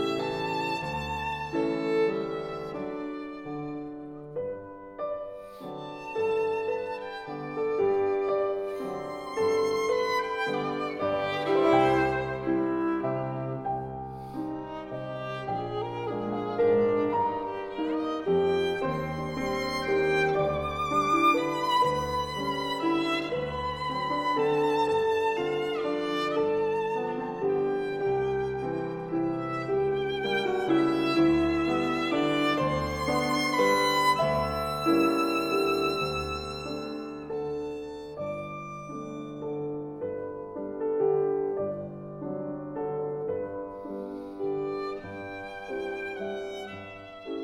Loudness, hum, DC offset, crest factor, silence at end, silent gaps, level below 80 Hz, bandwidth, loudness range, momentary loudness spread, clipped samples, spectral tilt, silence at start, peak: -29 LUFS; none; under 0.1%; 18 dB; 0 s; none; -54 dBFS; 19 kHz; 9 LU; 13 LU; under 0.1%; -5.5 dB/octave; 0 s; -10 dBFS